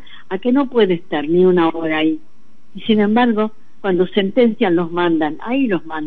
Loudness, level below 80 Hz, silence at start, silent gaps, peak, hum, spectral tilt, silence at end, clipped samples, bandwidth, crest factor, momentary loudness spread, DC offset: -17 LUFS; -64 dBFS; 0.3 s; none; -2 dBFS; none; -9 dB/octave; 0 s; under 0.1%; 4.5 kHz; 14 dB; 8 LU; 3%